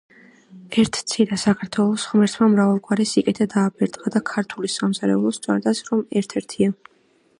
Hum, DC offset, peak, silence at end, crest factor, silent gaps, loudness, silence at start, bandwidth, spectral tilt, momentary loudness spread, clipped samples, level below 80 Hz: none; under 0.1%; -4 dBFS; 0.65 s; 16 dB; none; -21 LUFS; 0.55 s; 11.5 kHz; -5.5 dB/octave; 7 LU; under 0.1%; -60 dBFS